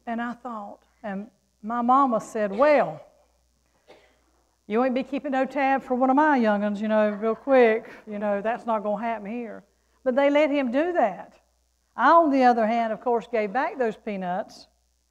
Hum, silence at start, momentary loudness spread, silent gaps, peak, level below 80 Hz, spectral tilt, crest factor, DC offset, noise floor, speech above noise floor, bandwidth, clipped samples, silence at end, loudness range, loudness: none; 0.05 s; 16 LU; none; -6 dBFS; -66 dBFS; -6.5 dB/octave; 18 dB; under 0.1%; -68 dBFS; 45 dB; 9.6 kHz; under 0.1%; 0.5 s; 4 LU; -23 LUFS